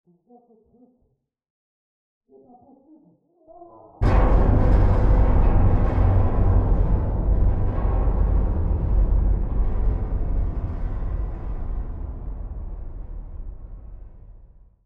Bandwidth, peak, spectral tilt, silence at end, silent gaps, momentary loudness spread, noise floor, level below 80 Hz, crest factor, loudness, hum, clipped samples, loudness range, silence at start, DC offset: 3.3 kHz; -8 dBFS; -10.5 dB/octave; 0.4 s; none; 19 LU; -69 dBFS; -22 dBFS; 14 dB; -23 LUFS; none; under 0.1%; 13 LU; 3.6 s; under 0.1%